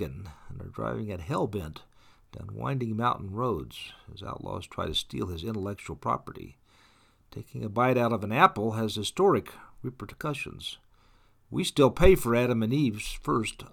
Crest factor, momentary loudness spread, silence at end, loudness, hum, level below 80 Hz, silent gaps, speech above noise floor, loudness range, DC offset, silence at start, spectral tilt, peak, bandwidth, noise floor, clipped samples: 24 dB; 21 LU; 0.05 s; -28 LUFS; none; -44 dBFS; none; 33 dB; 8 LU; under 0.1%; 0 s; -5.5 dB/octave; -4 dBFS; 19 kHz; -61 dBFS; under 0.1%